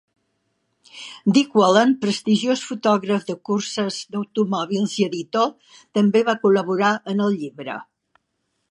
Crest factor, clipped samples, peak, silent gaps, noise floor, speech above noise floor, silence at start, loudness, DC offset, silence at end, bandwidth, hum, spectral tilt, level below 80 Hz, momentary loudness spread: 20 dB; under 0.1%; 0 dBFS; none; -73 dBFS; 54 dB; 0.95 s; -20 LUFS; under 0.1%; 0.85 s; 11 kHz; none; -5 dB/octave; -72 dBFS; 11 LU